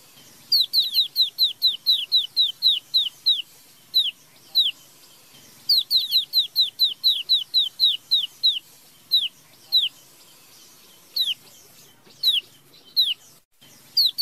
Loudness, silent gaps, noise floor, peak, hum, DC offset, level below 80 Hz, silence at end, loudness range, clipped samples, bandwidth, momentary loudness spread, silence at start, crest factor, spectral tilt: -20 LUFS; 13.45-13.51 s; -52 dBFS; -8 dBFS; none; under 0.1%; -78 dBFS; 0 s; 6 LU; under 0.1%; 16 kHz; 7 LU; 0.5 s; 16 dB; 2 dB/octave